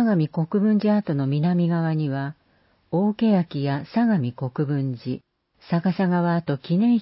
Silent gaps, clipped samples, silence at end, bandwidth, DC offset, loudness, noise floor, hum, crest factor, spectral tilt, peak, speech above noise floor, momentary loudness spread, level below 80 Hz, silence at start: none; under 0.1%; 0 s; 5.8 kHz; under 0.1%; -23 LUFS; -62 dBFS; none; 12 dB; -12.5 dB/octave; -10 dBFS; 41 dB; 8 LU; -64 dBFS; 0 s